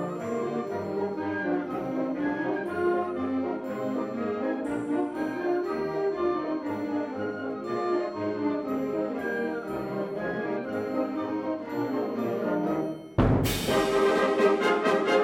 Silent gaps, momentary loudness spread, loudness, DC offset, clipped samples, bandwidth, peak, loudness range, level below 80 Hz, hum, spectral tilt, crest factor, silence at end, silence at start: none; 8 LU; -29 LUFS; under 0.1%; under 0.1%; 17.5 kHz; -10 dBFS; 5 LU; -48 dBFS; none; -6 dB/octave; 18 dB; 0 s; 0 s